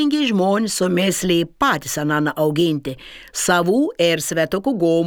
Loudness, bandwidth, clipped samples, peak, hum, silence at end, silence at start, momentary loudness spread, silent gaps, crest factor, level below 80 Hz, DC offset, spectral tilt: -18 LUFS; over 20 kHz; under 0.1%; -2 dBFS; none; 0 s; 0 s; 5 LU; none; 18 dB; -50 dBFS; under 0.1%; -4.5 dB/octave